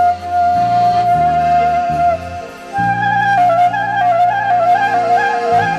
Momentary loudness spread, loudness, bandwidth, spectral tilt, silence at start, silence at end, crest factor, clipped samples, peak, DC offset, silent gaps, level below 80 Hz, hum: 5 LU; -13 LUFS; 9.6 kHz; -5.5 dB/octave; 0 s; 0 s; 10 dB; under 0.1%; -4 dBFS; under 0.1%; none; -42 dBFS; none